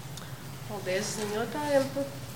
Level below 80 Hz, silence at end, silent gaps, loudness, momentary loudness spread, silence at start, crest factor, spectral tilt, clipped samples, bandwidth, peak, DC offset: -60 dBFS; 0 s; none; -31 LUFS; 13 LU; 0 s; 20 dB; -4.5 dB/octave; under 0.1%; 17 kHz; -12 dBFS; 0.3%